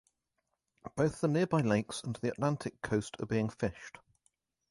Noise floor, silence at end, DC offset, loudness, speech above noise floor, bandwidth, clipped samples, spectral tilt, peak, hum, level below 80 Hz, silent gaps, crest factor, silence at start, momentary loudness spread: -84 dBFS; 0.8 s; under 0.1%; -33 LUFS; 51 dB; 11.5 kHz; under 0.1%; -6.5 dB/octave; -16 dBFS; none; -62 dBFS; none; 18 dB; 0.85 s; 13 LU